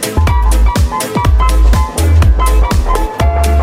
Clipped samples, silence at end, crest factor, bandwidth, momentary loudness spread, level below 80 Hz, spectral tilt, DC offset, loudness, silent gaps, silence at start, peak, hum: under 0.1%; 0 s; 8 dB; 16 kHz; 4 LU; -10 dBFS; -5.5 dB/octave; under 0.1%; -12 LUFS; none; 0 s; 0 dBFS; none